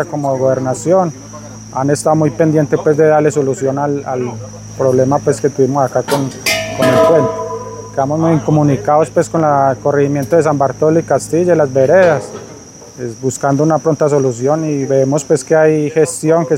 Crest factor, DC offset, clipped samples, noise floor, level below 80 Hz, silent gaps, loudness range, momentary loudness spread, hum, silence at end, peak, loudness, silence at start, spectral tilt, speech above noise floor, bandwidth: 12 dB; under 0.1%; under 0.1%; -34 dBFS; -48 dBFS; none; 2 LU; 12 LU; none; 0 s; 0 dBFS; -13 LUFS; 0 s; -6 dB/octave; 22 dB; 16.5 kHz